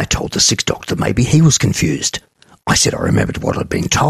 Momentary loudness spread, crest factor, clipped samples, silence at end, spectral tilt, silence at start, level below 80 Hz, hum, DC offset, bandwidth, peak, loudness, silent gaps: 8 LU; 14 dB; under 0.1%; 0 s; -4 dB/octave; 0 s; -36 dBFS; none; under 0.1%; 14.5 kHz; 0 dBFS; -15 LUFS; none